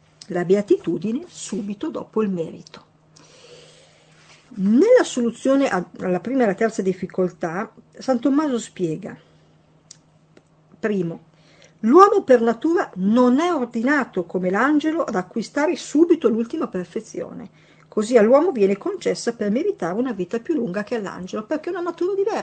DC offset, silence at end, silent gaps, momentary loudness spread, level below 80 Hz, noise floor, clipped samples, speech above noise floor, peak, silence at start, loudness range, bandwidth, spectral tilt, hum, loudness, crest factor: under 0.1%; 0 s; none; 13 LU; -66 dBFS; -55 dBFS; under 0.1%; 35 dB; 0 dBFS; 0.3 s; 8 LU; 9 kHz; -6 dB/octave; none; -21 LUFS; 20 dB